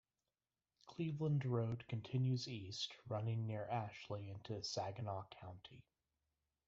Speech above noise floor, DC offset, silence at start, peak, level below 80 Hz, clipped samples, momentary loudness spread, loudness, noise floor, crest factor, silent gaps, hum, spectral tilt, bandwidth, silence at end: over 47 dB; under 0.1%; 0.85 s; -26 dBFS; -78 dBFS; under 0.1%; 15 LU; -44 LUFS; under -90 dBFS; 18 dB; none; none; -6 dB/octave; 7.8 kHz; 0.85 s